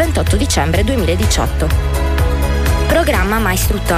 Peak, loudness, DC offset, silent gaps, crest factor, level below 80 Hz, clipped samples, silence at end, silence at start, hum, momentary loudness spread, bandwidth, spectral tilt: -4 dBFS; -15 LUFS; under 0.1%; none; 10 dB; -18 dBFS; under 0.1%; 0 s; 0 s; none; 3 LU; 15.5 kHz; -5 dB/octave